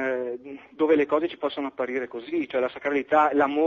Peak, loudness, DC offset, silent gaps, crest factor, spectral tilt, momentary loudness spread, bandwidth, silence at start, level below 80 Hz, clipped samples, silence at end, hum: -8 dBFS; -25 LUFS; under 0.1%; none; 16 dB; -2.5 dB/octave; 10 LU; 7 kHz; 0 s; -68 dBFS; under 0.1%; 0 s; none